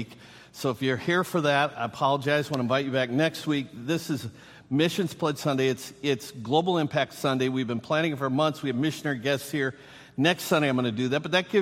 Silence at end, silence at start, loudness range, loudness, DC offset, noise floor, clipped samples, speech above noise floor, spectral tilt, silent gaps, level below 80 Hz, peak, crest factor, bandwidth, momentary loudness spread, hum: 0 s; 0 s; 2 LU; -27 LUFS; under 0.1%; -49 dBFS; under 0.1%; 22 dB; -5.5 dB/octave; none; -68 dBFS; -8 dBFS; 18 dB; 16 kHz; 7 LU; none